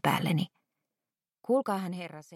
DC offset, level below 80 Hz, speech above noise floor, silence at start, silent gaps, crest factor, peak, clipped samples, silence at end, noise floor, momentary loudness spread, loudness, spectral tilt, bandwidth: under 0.1%; -78 dBFS; over 60 dB; 0.05 s; none; 20 dB; -12 dBFS; under 0.1%; 0 s; under -90 dBFS; 12 LU; -31 LUFS; -6 dB/octave; 16.5 kHz